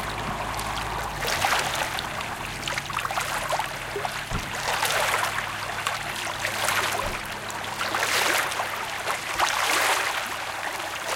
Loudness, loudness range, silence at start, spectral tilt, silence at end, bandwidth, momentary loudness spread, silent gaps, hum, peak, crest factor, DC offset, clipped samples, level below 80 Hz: -26 LUFS; 3 LU; 0 s; -1.5 dB/octave; 0 s; 17 kHz; 8 LU; none; none; -6 dBFS; 20 dB; under 0.1%; under 0.1%; -46 dBFS